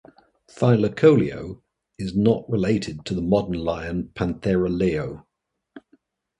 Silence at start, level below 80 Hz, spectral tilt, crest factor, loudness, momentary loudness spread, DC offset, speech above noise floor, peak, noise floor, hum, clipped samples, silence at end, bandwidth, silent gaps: 0.55 s; -46 dBFS; -8 dB/octave; 20 dB; -22 LUFS; 17 LU; under 0.1%; 58 dB; -4 dBFS; -79 dBFS; none; under 0.1%; 0.6 s; 10.5 kHz; none